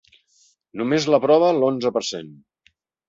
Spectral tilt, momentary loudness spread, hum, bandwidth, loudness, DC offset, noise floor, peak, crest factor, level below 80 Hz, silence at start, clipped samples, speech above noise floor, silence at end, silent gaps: -5 dB/octave; 15 LU; none; 7.8 kHz; -19 LUFS; under 0.1%; -63 dBFS; -4 dBFS; 18 dB; -66 dBFS; 0.75 s; under 0.1%; 44 dB; 0.75 s; none